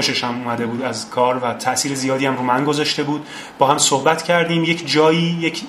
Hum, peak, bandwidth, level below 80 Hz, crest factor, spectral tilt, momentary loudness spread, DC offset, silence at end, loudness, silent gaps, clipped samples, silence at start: none; 0 dBFS; 15.5 kHz; -62 dBFS; 18 dB; -3.5 dB/octave; 8 LU; under 0.1%; 0 s; -18 LUFS; none; under 0.1%; 0 s